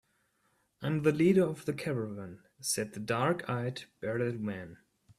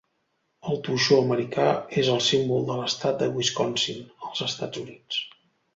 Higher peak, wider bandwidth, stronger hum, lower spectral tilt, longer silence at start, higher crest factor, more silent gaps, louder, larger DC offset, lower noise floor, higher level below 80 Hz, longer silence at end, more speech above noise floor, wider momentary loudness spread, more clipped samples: second, -12 dBFS vs -6 dBFS; first, 14.5 kHz vs 8 kHz; neither; first, -5.5 dB/octave vs -4 dB/octave; first, 0.8 s vs 0.65 s; about the same, 20 dB vs 20 dB; neither; second, -32 LUFS vs -25 LUFS; neither; about the same, -74 dBFS vs -74 dBFS; about the same, -68 dBFS vs -64 dBFS; about the same, 0.45 s vs 0.45 s; second, 43 dB vs 49 dB; about the same, 14 LU vs 13 LU; neither